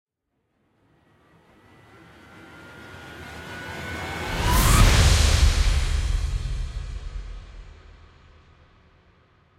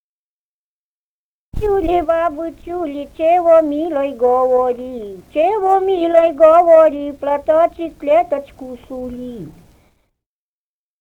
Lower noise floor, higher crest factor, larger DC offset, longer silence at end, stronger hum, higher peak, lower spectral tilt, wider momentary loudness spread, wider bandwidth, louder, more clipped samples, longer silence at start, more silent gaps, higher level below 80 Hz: second, -75 dBFS vs under -90 dBFS; about the same, 20 dB vs 16 dB; neither; first, 1.85 s vs 1.5 s; neither; second, -4 dBFS vs 0 dBFS; second, -4 dB/octave vs -7 dB/octave; first, 26 LU vs 18 LU; first, 16 kHz vs 8 kHz; second, -22 LUFS vs -15 LUFS; neither; first, 2.35 s vs 1.55 s; neither; first, -26 dBFS vs -40 dBFS